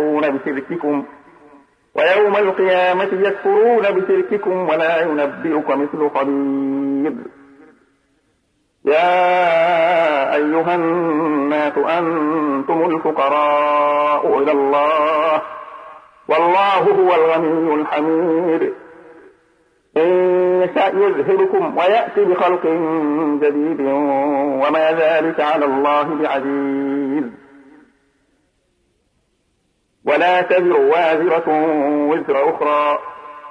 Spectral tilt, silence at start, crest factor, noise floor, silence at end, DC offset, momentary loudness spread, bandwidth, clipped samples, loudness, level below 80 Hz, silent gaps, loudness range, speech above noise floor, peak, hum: -7 dB/octave; 0 s; 14 dB; -65 dBFS; 0 s; under 0.1%; 7 LU; 9.6 kHz; under 0.1%; -16 LUFS; -68 dBFS; none; 5 LU; 49 dB; -2 dBFS; none